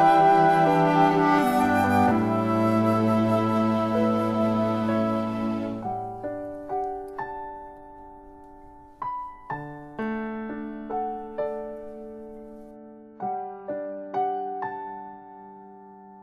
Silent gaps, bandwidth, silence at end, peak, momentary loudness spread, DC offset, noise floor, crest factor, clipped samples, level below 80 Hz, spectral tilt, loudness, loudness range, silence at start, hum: none; 13 kHz; 0 s; -8 dBFS; 21 LU; under 0.1%; -47 dBFS; 18 dB; under 0.1%; -56 dBFS; -7.5 dB/octave; -25 LUFS; 14 LU; 0 s; none